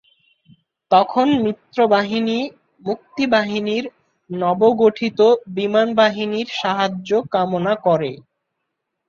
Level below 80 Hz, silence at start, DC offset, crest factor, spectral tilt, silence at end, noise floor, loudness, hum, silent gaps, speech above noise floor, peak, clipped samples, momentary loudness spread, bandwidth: -62 dBFS; 0.9 s; under 0.1%; 18 dB; -6 dB/octave; 0.9 s; -77 dBFS; -18 LUFS; none; none; 59 dB; -2 dBFS; under 0.1%; 11 LU; 7.2 kHz